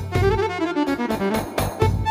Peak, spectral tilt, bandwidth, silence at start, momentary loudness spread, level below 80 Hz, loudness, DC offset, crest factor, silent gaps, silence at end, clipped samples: -6 dBFS; -6.5 dB/octave; 16 kHz; 0 s; 3 LU; -34 dBFS; -22 LUFS; under 0.1%; 16 dB; none; 0 s; under 0.1%